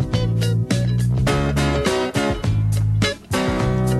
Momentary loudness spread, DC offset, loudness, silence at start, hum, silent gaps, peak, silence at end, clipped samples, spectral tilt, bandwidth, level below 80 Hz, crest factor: 2 LU; under 0.1%; -20 LUFS; 0 s; none; none; -6 dBFS; 0 s; under 0.1%; -6 dB/octave; 12.5 kHz; -30 dBFS; 14 dB